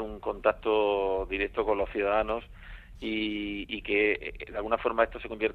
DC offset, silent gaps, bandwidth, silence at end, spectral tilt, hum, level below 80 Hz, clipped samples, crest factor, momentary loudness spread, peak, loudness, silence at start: under 0.1%; none; 4.7 kHz; 0 s; -6.5 dB/octave; none; -48 dBFS; under 0.1%; 20 dB; 11 LU; -10 dBFS; -29 LUFS; 0 s